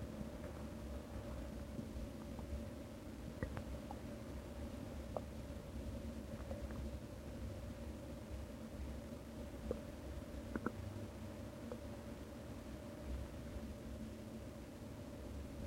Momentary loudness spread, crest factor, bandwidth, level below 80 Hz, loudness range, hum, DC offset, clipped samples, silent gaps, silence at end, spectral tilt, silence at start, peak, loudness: 4 LU; 24 dB; 16 kHz; -52 dBFS; 1 LU; none; under 0.1%; under 0.1%; none; 0 s; -6.5 dB/octave; 0 s; -24 dBFS; -50 LUFS